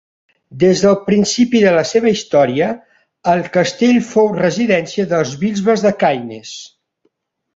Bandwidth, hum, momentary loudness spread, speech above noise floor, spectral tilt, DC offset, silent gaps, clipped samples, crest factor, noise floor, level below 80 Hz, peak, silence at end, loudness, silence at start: 8 kHz; none; 10 LU; 51 dB; -5 dB/octave; under 0.1%; none; under 0.1%; 14 dB; -65 dBFS; -54 dBFS; 0 dBFS; 0.9 s; -14 LUFS; 0.5 s